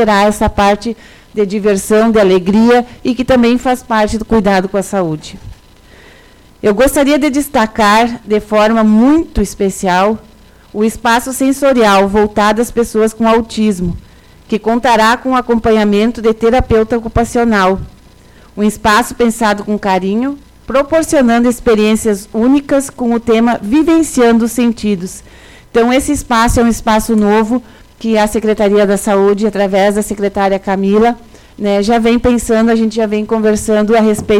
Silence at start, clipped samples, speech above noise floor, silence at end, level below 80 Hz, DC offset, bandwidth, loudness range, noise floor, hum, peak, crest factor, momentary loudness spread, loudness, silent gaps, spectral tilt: 0 s; under 0.1%; 30 dB; 0 s; -32 dBFS; under 0.1%; 16 kHz; 2 LU; -41 dBFS; none; -2 dBFS; 8 dB; 7 LU; -12 LUFS; none; -5 dB/octave